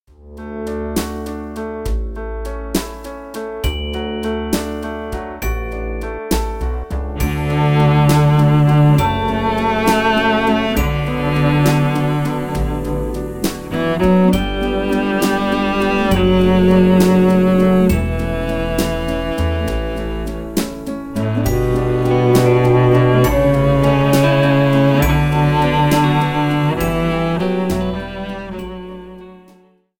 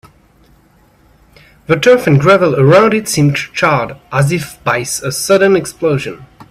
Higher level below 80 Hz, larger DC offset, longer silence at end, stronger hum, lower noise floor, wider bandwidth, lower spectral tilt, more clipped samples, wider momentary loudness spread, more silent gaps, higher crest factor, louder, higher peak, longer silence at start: first, -28 dBFS vs -46 dBFS; neither; first, 0.65 s vs 0.1 s; neither; about the same, -50 dBFS vs -49 dBFS; about the same, 17 kHz vs 15.5 kHz; about the same, -6.5 dB/octave vs -5.5 dB/octave; neither; first, 14 LU vs 9 LU; neither; about the same, 14 dB vs 12 dB; second, -16 LUFS vs -12 LUFS; about the same, -2 dBFS vs 0 dBFS; second, 0.25 s vs 1.7 s